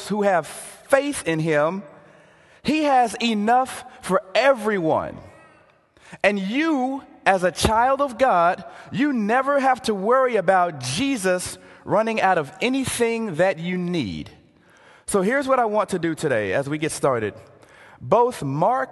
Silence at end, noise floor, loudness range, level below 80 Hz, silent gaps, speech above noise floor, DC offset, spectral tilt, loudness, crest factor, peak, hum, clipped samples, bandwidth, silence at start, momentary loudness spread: 0 s; -55 dBFS; 3 LU; -50 dBFS; none; 35 dB; under 0.1%; -5 dB/octave; -21 LUFS; 20 dB; -2 dBFS; none; under 0.1%; 12.5 kHz; 0 s; 11 LU